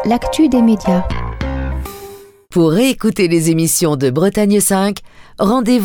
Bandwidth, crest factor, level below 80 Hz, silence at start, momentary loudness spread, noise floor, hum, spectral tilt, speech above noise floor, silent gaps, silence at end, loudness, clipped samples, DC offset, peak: over 20 kHz; 12 dB; -30 dBFS; 0 s; 11 LU; -36 dBFS; none; -5 dB/octave; 23 dB; none; 0 s; -14 LUFS; under 0.1%; under 0.1%; -2 dBFS